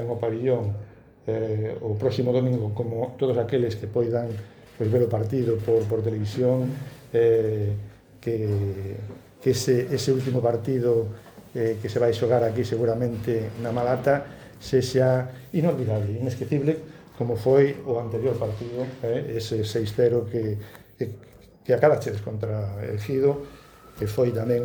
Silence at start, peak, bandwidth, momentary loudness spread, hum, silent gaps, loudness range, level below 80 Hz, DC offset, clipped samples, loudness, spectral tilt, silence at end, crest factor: 0 s; -6 dBFS; over 20 kHz; 12 LU; none; none; 2 LU; -56 dBFS; under 0.1%; under 0.1%; -25 LUFS; -7 dB/octave; 0 s; 20 dB